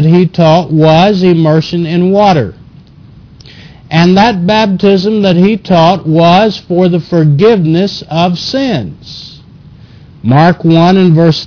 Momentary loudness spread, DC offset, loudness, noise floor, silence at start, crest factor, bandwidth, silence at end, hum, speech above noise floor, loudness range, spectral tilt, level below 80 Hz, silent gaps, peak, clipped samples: 7 LU; under 0.1%; -8 LUFS; -36 dBFS; 0 s; 8 dB; 5.4 kHz; 0 s; none; 28 dB; 4 LU; -7.5 dB/octave; -40 dBFS; none; 0 dBFS; 0.5%